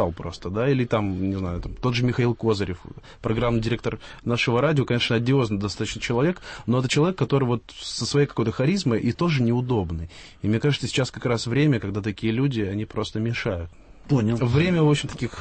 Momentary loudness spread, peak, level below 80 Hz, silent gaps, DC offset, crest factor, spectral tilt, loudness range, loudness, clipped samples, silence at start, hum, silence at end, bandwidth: 10 LU; -8 dBFS; -44 dBFS; none; under 0.1%; 16 dB; -6 dB/octave; 2 LU; -24 LUFS; under 0.1%; 0 s; none; 0 s; 8.8 kHz